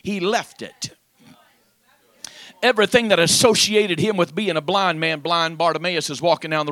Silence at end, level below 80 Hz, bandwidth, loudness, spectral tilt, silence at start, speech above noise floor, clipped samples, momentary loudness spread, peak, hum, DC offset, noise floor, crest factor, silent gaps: 0 s; -60 dBFS; 16.5 kHz; -18 LUFS; -3 dB/octave; 0.05 s; 40 dB; under 0.1%; 18 LU; 0 dBFS; none; under 0.1%; -60 dBFS; 20 dB; none